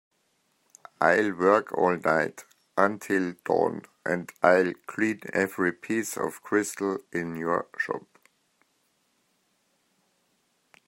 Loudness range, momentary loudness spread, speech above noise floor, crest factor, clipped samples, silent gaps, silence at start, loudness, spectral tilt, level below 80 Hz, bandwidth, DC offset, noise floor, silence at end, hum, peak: 10 LU; 9 LU; 45 dB; 24 dB; under 0.1%; none; 1 s; -26 LUFS; -5 dB/octave; -74 dBFS; 16 kHz; under 0.1%; -71 dBFS; 2.9 s; none; -6 dBFS